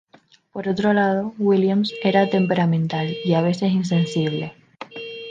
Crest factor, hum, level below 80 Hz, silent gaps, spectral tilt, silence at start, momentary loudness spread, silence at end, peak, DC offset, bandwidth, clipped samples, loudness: 18 dB; none; -64 dBFS; none; -7 dB/octave; 0.55 s; 15 LU; 0 s; -2 dBFS; under 0.1%; 9 kHz; under 0.1%; -20 LUFS